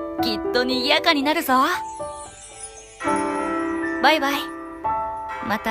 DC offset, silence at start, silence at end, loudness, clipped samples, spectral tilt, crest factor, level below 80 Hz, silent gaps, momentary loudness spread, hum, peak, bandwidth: under 0.1%; 0 s; 0 s; -21 LUFS; under 0.1%; -3 dB/octave; 20 dB; -52 dBFS; none; 18 LU; none; -4 dBFS; 15.5 kHz